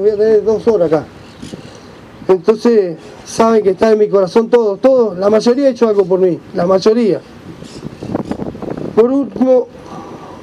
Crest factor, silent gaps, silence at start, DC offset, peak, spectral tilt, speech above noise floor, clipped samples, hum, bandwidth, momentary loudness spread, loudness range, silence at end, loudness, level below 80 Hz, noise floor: 14 dB; none; 0 s; under 0.1%; 0 dBFS; -6.5 dB/octave; 24 dB; under 0.1%; none; 11 kHz; 19 LU; 4 LU; 0 s; -13 LUFS; -48 dBFS; -36 dBFS